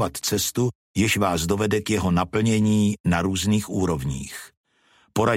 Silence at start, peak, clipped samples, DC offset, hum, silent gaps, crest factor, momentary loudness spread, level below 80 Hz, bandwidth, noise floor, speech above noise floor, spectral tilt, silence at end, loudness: 0 s; -6 dBFS; under 0.1%; under 0.1%; none; 0.75-0.94 s, 3.00-3.04 s, 4.57-4.64 s; 16 dB; 8 LU; -44 dBFS; 16.5 kHz; -61 dBFS; 39 dB; -5 dB/octave; 0 s; -23 LUFS